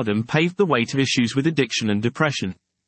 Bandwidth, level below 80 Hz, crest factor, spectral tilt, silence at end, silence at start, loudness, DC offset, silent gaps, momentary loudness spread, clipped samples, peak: 8.8 kHz; -62 dBFS; 16 dB; -5 dB/octave; 0.35 s; 0 s; -21 LUFS; under 0.1%; none; 3 LU; under 0.1%; -4 dBFS